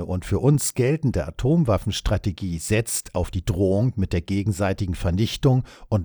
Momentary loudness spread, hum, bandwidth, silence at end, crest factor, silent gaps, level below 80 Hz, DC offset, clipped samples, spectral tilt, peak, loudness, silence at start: 6 LU; none; over 20 kHz; 0 s; 16 dB; none; -36 dBFS; under 0.1%; under 0.1%; -6 dB/octave; -6 dBFS; -23 LUFS; 0 s